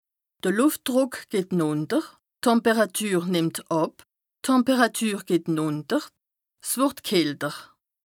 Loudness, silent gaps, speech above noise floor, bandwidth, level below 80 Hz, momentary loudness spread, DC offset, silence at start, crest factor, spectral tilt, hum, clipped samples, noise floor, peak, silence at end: -24 LUFS; none; 32 dB; 19.5 kHz; -72 dBFS; 9 LU; under 0.1%; 0.45 s; 18 dB; -4.5 dB/octave; none; under 0.1%; -56 dBFS; -6 dBFS; 0.4 s